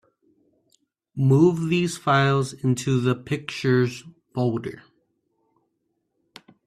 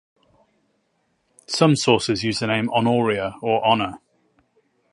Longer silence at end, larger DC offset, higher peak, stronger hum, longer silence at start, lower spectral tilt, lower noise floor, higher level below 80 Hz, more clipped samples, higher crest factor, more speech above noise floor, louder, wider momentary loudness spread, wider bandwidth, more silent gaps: first, 1.85 s vs 0.95 s; neither; second, -6 dBFS vs -2 dBFS; neither; second, 1.15 s vs 1.5 s; first, -6.5 dB/octave vs -5 dB/octave; first, -75 dBFS vs -69 dBFS; about the same, -60 dBFS vs -56 dBFS; neither; about the same, 18 dB vs 22 dB; first, 53 dB vs 49 dB; about the same, -22 LUFS vs -20 LUFS; first, 14 LU vs 6 LU; first, 13 kHz vs 11.5 kHz; neither